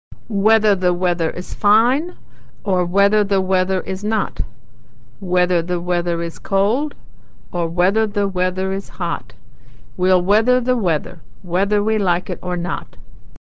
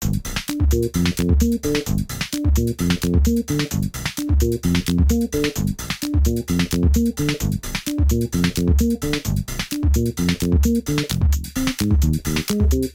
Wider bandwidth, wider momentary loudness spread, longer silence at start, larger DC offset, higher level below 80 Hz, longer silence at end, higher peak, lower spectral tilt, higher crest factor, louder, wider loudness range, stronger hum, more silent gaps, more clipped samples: second, 8 kHz vs 17 kHz; first, 11 LU vs 6 LU; about the same, 0.1 s vs 0 s; first, 7% vs under 0.1%; second, -36 dBFS vs -24 dBFS; about the same, 0.1 s vs 0 s; about the same, -2 dBFS vs -4 dBFS; first, -7 dB/octave vs -5.5 dB/octave; about the same, 16 dB vs 14 dB; about the same, -19 LUFS vs -21 LUFS; about the same, 3 LU vs 1 LU; neither; neither; neither